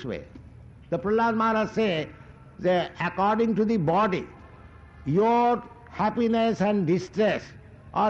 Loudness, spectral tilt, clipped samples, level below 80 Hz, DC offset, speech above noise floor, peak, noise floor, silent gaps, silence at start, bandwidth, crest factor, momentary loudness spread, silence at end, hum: -25 LUFS; -7 dB/octave; under 0.1%; -54 dBFS; under 0.1%; 24 dB; -14 dBFS; -48 dBFS; none; 0 s; 7.6 kHz; 10 dB; 12 LU; 0 s; none